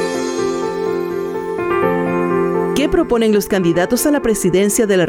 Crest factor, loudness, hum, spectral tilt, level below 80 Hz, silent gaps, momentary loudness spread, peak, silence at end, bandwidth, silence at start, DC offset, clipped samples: 12 dB; -16 LUFS; none; -5 dB/octave; -40 dBFS; none; 6 LU; -4 dBFS; 0 s; 18.5 kHz; 0 s; under 0.1%; under 0.1%